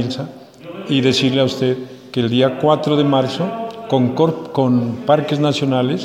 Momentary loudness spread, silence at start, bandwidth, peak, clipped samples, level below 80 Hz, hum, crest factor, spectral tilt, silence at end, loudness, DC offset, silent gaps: 11 LU; 0 s; 12 kHz; -2 dBFS; under 0.1%; -58 dBFS; none; 16 dB; -6.5 dB/octave; 0 s; -17 LUFS; under 0.1%; none